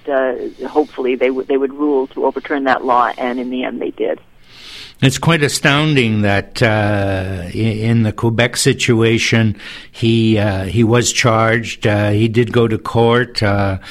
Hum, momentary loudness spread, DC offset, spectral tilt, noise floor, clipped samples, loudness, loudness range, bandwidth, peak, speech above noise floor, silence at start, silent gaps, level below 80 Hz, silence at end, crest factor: none; 8 LU; 0.5%; -5 dB/octave; -37 dBFS; under 0.1%; -15 LUFS; 3 LU; 14.5 kHz; 0 dBFS; 22 dB; 0.05 s; none; -42 dBFS; 0 s; 14 dB